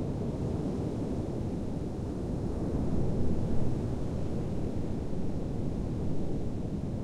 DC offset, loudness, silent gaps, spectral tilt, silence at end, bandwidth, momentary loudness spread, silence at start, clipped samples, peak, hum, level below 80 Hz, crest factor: under 0.1%; -34 LUFS; none; -9 dB/octave; 0 s; 10 kHz; 4 LU; 0 s; under 0.1%; -16 dBFS; none; -40 dBFS; 14 dB